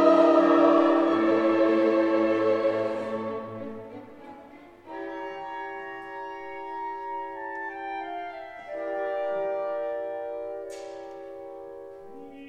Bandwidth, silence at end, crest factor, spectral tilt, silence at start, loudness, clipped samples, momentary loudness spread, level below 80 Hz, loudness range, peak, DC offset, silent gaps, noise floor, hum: 8.2 kHz; 0 s; 20 dB; -6.5 dB/octave; 0 s; -26 LUFS; under 0.1%; 22 LU; -70 dBFS; 14 LU; -8 dBFS; under 0.1%; none; -48 dBFS; none